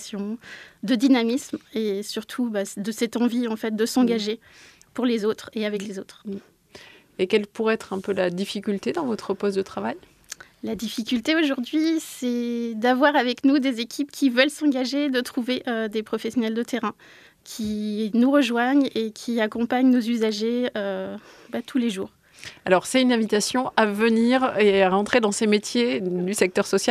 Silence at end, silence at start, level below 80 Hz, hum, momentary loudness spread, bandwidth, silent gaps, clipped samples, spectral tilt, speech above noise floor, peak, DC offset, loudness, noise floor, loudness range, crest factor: 0 s; 0 s; -64 dBFS; none; 14 LU; 14.5 kHz; none; under 0.1%; -4.5 dB/octave; 25 dB; -2 dBFS; under 0.1%; -23 LUFS; -48 dBFS; 6 LU; 20 dB